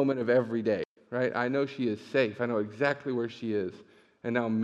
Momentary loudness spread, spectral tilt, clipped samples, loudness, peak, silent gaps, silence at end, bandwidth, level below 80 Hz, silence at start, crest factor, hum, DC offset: 7 LU; -7.5 dB/octave; under 0.1%; -30 LUFS; -12 dBFS; 0.85-0.96 s; 0 s; 8.4 kHz; -80 dBFS; 0 s; 18 dB; none; under 0.1%